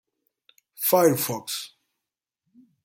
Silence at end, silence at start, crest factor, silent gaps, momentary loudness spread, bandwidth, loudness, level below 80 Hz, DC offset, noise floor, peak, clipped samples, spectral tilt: 1.15 s; 0.8 s; 22 dB; none; 13 LU; 17 kHz; -23 LUFS; -70 dBFS; under 0.1%; -87 dBFS; -6 dBFS; under 0.1%; -4 dB/octave